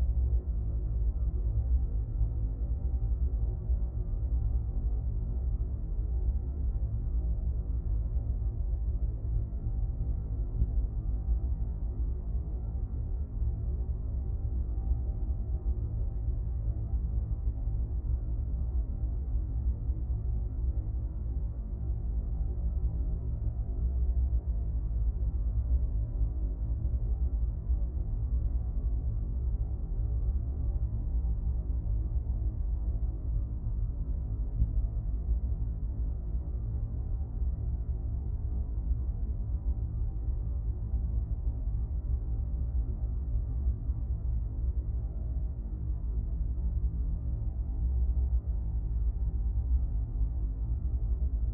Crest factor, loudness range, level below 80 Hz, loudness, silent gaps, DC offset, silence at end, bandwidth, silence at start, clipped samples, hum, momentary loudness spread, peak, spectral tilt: 16 dB; 2 LU; -32 dBFS; -34 LUFS; none; under 0.1%; 0 s; 1.4 kHz; 0 s; under 0.1%; none; 4 LU; -16 dBFS; -14 dB/octave